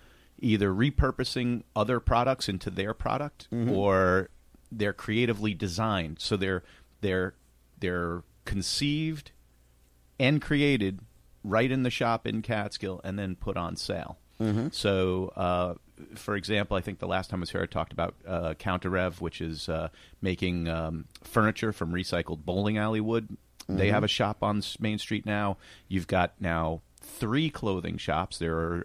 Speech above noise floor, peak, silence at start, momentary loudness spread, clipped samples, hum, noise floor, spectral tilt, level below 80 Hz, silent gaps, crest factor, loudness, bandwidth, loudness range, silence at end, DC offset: 33 dB; -10 dBFS; 0.4 s; 9 LU; under 0.1%; none; -61 dBFS; -6 dB/octave; -46 dBFS; none; 20 dB; -29 LUFS; 15.5 kHz; 4 LU; 0 s; under 0.1%